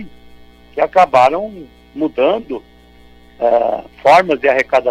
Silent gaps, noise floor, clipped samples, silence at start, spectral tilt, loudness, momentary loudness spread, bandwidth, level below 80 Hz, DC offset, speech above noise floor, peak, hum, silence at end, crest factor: none; -43 dBFS; under 0.1%; 0 s; -5 dB/octave; -14 LUFS; 18 LU; 12.5 kHz; -48 dBFS; under 0.1%; 30 dB; -2 dBFS; 60 Hz at -50 dBFS; 0 s; 12 dB